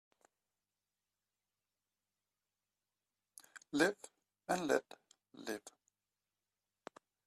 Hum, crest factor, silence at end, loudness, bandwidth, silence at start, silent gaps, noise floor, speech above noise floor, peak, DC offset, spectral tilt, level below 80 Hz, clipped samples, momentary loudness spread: 50 Hz at -80 dBFS; 26 dB; 1.6 s; -38 LUFS; 14 kHz; 3.55 s; none; under -90 dBFS; over 53 dB; -18 dBFS; under 0.1%; -3.5 dB/octave; -82 dBFS; under 0.1%; 25 LU